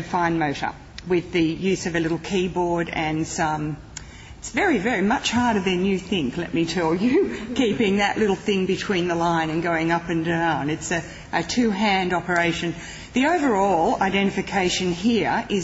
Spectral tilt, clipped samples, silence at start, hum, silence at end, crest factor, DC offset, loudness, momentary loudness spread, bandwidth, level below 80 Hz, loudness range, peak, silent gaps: -5 dB/octave; under 0.1%; 0 s; none; 0 s; 16 dB; under 0.1%; -22 LUFS; 7 LU; 8 kHz; -46 dBFS; 3 LU; -6 dBFS; none